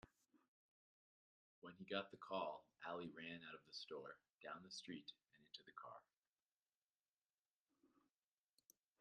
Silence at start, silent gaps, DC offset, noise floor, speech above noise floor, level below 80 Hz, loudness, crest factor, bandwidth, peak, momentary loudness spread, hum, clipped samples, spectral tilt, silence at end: 0.05 s; 0.48-1.62 s, 4.34-4.38 s, 6.18-6.36 s, 6.42-6.66 s, 6.77-7.06 s, 7.17-7.30 s, 7.39-7.66 s; under 0.1%; under -90 dBFS; over 37 dB; under -90 dBFS; -54 LUFS; 28 dB; 9.6 kHz; -28 dBFS; 13 LU; none; under 0.1%; -4 dB/octave; 1.15 s